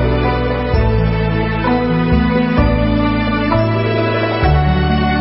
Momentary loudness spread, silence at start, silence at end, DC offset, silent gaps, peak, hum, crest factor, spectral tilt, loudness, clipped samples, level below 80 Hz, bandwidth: 2 LU; 0 s; 0 s; under 0.1%; none; -2 dBFS; none; 12 dB; -12 dB/octave; -15 LUFS; under 0.1%; -20 dBFS; 5.8 kHz